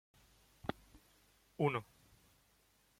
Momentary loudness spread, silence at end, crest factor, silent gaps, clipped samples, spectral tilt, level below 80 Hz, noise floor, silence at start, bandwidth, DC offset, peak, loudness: 23 LU; 1.2 s; 24 dB; none; under 0.1%; -7 dB/octave; -70 dBFS; -73 dBFS; 0.65 s; 16.5 kHz; under 0.1%; -20 dBFS; -41 LUFS